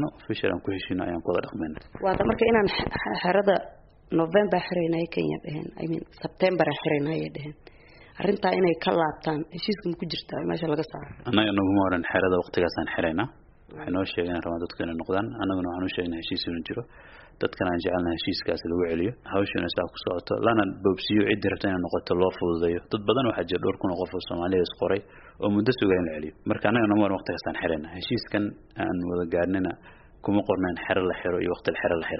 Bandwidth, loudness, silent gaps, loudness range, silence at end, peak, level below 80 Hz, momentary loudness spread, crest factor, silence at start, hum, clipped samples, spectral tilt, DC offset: 5.8 kHz; -27 LUFS; none; 4 LU; 0 s; -4 dBFS; -52 dBFS; 9 LU; 22 dB; 0 s; none; under 0.1%; -4.5 dB/octave; under 0.1%